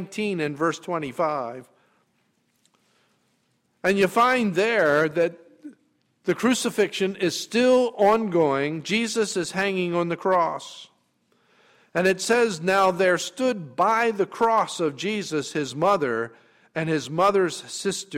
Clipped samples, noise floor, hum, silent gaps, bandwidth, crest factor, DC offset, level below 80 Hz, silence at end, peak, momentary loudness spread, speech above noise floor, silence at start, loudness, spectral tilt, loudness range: under 0.1%; -69 dBFS; none; none; 16 kHz; 16 dB; under 0.1%; -66 dBFS; 0 s; -8 dBFS; 9 LU; 46 dB; 0 s; -23 LUFS; -4.5 dB/octave; 4 LU